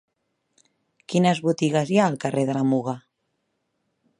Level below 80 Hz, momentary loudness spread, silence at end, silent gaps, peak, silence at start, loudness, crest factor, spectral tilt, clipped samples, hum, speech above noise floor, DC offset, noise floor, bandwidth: -72 dBFS; 6 LU; 1.2 s; none; -4 dBFS; 1.1 s; -22 LUFS; 20 dB; -6.5 dB/octave; under 0.1%; none; 54 dB; under 0.1%; -75 dBFS; 11 kHz